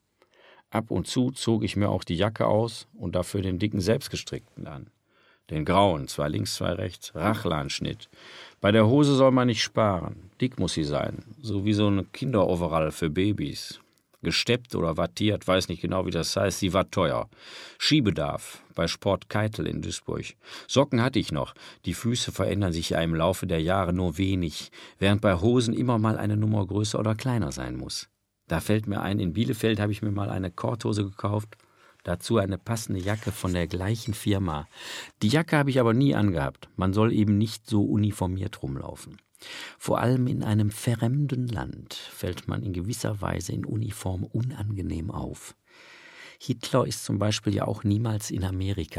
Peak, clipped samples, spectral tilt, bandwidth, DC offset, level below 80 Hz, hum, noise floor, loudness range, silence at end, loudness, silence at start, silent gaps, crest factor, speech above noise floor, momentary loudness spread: -6 dBFS; under 0.1%; -6 dB/octave; 15.5 kHz; under 0.1%; -50 dBFS; none; -63 dBFS; 6 LU; 0 s; -27 LUFS; 0.7 s; none; 22 dB; 37 dB; 14 LU